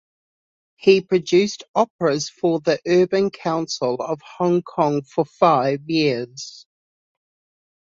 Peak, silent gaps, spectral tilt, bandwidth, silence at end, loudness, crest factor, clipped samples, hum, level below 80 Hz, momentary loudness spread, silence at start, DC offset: -2 dBFS; 1.68-1.74 s, 1.90-1.99 s; -5.5 dB/octave; 7.6 kHz; 1.25 s; -20 LUFS; 20 dB; under 0.1%; none; -64 dBFS; 8 LU; 0.85 s; under 0.1%